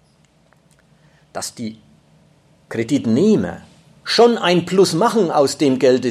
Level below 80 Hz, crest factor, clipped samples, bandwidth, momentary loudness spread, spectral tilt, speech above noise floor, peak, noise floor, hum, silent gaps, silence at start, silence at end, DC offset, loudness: -60 dBFS; 16 dB; under 0.1%; 14 kHz; 18 LU; -5 dB/octave; 40 dB; -2 dBFS; -55 dBFS; none; none; 1.35 s; 0 s; under 0.1%; -16 LUFS